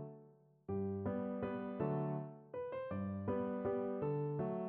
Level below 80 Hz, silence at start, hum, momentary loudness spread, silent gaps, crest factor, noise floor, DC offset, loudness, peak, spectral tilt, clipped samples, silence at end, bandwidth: -70 dBFS; 0 s; none; 8 LU; none; 14 dB; -64 dBFS; under 0.1%; -41 LUFS; -28 dBFS; -9.5 dB/octave; under 0.1%; 0 s; 3.9 kHz